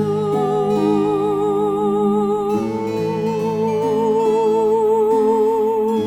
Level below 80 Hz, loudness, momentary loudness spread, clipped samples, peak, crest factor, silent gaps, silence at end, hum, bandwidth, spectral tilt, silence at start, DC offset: -54 dBFS; -18 LUFS; 5 LU; under 0.1%; -6 dBFS; 10 dB; none; 0 s; none; 13.5 kHz; -7.5 dB/octave; 0 s; under 0.1%